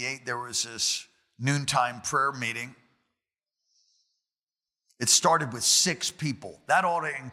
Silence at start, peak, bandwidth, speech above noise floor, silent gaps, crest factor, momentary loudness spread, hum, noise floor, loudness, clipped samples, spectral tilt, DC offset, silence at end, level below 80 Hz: 0 s; -8 dBFS; 16.5 kHz; over 63 dB; 4.43-4.47 s; 22 dB; 12 LU; none; under -90 dBFS; -25 LUFS; under 0.1%; -2 dB/octave; under 0.1%; 0 s; -70 dBFS